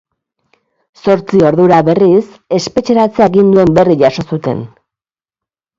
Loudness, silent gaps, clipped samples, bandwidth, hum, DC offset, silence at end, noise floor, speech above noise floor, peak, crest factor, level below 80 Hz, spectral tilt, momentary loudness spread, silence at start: -10 LUFS; none; under 0.1%; 7.8 kHz; none; under 0.1%; 1.1 s; -89 dBFS; 80 dB; 0 dBFS; 12 dB; -44 dBFS; -7 dB/octave; 10 LU; 1.05 s